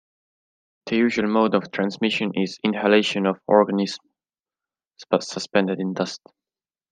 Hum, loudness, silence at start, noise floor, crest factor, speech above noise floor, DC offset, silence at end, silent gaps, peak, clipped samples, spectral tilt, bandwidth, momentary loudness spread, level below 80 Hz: none; -22 LUFS; 0.85 s; under -90 dBFS; 20 dB; over 69 dB; under 0.1%; 0.75 s; 4.40-4.44 s; -2 dBFS; under 0.1%; -5.5 dB/octave; 9.6 kHz; 10 LU; -68 dBFS